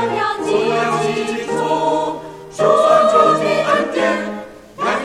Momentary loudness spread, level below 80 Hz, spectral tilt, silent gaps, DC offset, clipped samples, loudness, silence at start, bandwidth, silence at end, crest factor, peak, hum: 14 LU; -54 dBFS; -4.5 dB/octave; none; under 0.1%; under 0.1%; -16 LUFS; 0 s; 13 kHz; 0 s; 16 dB; 0 dBFS; none